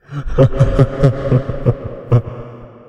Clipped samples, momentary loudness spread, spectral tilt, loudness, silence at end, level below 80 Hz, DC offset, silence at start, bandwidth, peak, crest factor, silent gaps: under 0.1%; 15 LU; -9.5 dB/octave; -15 LUFS; 0.1 s; -26 dBFS; under 0.1%; 0.1 s; 6.8 kHz; 0 dBFS; 16 dB; none